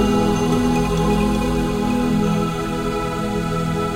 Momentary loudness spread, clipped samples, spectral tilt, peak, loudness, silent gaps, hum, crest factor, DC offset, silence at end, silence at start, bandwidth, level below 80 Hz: 5 LU; under 0.1%; -6.5 dB/octave; -6 dBFS; -20 LUFS; none; none; 14 dB; under 0.1%; 0 s; 0 s; 16 kHz; -30 dBFS